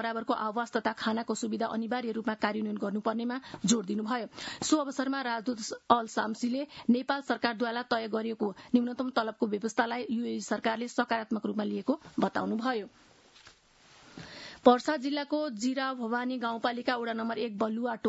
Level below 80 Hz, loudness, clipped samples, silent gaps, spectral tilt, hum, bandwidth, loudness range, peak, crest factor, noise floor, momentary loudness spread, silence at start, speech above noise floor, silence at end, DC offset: -74 dBFS; -31 LUFS; under 0.1%; none; -4 dB/octave; none; 8 kHz; 2 LU; -6 dBFS; 24 dB; -60 dBFS; 6 LU; 0 s; 29 dB; 0 s; under 0.1%